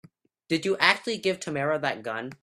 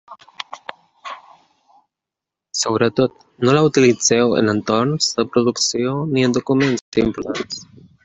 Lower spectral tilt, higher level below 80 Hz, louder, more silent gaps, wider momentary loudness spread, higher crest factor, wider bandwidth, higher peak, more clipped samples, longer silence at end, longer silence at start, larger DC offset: about the same, -4 dB/octave vs -4.5 dB/octave; second, -70 dBFS vs -52 dBFS; second, -26 LUFS vs -17 LUFS; second, none vs 6.81-6.92 s; second, 9 LU vs 20 LU; first, 26 dB vs 16 dB; first, 14.5 kHz vs 8.2 kHz; about the same, -2 dBFS vs -2 dBFS; neither; second, 0.1 s vs 0.4 s; first, 0.5 s vs 0.1 s; neither